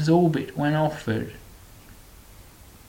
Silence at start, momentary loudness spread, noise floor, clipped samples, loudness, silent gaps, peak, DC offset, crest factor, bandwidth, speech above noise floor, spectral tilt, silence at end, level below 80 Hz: 0 s; 15 LU; -48 dBFS; under 0.1%; -24 LUFS; none; -8 dBFS; under 0.1%; 18 dB; 17 kHz; 25 dB; -7.5 dB/octave; 0.45 s; -50 dBFS